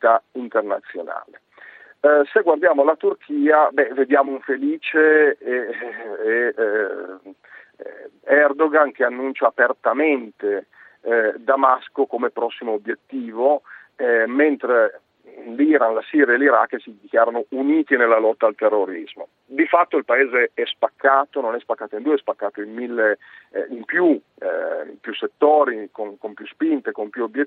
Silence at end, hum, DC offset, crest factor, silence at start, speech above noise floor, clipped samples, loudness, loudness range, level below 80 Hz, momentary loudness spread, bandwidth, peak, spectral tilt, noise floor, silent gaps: 0 s; none; under 0.1%; 18 dB; 0 s; 26 dB; under 0.1%; -19 LUFS; 4 LU; -80 dBFS; 14 LU; 4.2 kHz; -2 dBFS; -7.5 dB/octave; -45 dBFS; none